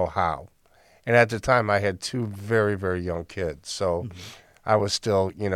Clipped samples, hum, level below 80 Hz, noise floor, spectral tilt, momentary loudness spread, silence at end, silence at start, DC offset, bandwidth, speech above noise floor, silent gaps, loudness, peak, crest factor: under 0.1%; none; -50 dBFS; -58 dBFS; -5 dB/octave; 16 LU; 0 s; 0 s; under 0.1%; 15.5 kHz; 34 dB; none; -24 LUFS; -4 dBFS; 20 dB